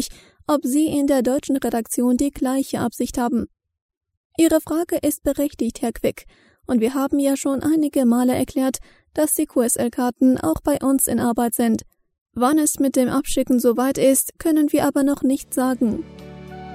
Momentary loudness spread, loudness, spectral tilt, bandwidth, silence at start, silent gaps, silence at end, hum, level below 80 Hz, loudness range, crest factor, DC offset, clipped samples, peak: 8 LU; -20 LUFS; -4.5 dB/octave; 16 kHz; 0 s; 3.82-3.89 s, 3.97-4.01 s, 4.17-4.30 s, 12.21-12.26 s; 0 s; none; -46 dBFS; 4 LU; 16 dB; under 0.1%; under 0.1%; -4 dBFS